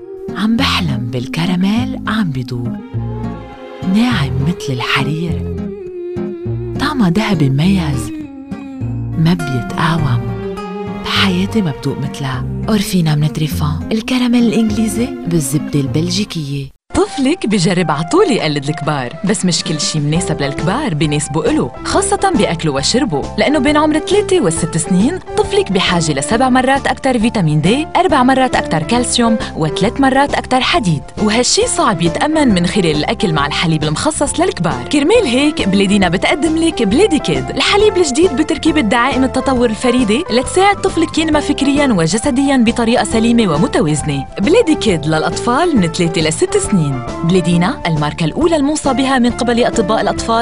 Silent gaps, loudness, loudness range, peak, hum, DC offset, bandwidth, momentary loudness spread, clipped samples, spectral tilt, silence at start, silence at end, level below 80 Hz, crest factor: none; -14 LUFS; 4 LU; 0 dBFS; none; 1%; 15.5 kHz; 8 LU; under 0.1%; -5 dB/octave; 0 s; 0 s; -34 dBFS; 14 dB